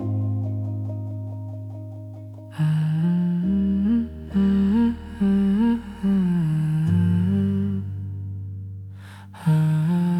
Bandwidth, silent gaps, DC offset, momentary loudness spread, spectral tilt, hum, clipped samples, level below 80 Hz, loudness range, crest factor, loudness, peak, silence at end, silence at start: 11.5 kHz; none; under 0.1%; 16 LU; -9.5 dB/octave; none; under 0.1%; -46 dBFS; 4 LU; 12 dB; -23 LUFS; -10 dBFS; 0 s; 0 s